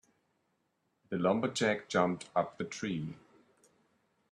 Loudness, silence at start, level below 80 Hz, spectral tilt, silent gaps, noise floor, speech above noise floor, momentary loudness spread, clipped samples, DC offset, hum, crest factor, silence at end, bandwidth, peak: -33 LUFS; 1.1 s; -74 dBFS; -5 dB/octave; none; -79 dBFS; 46 dB; 10 LU; under 0.1%; under 0.1%; none; 24 dB; 1.15 s; 11.5 kHz; -12 dBFS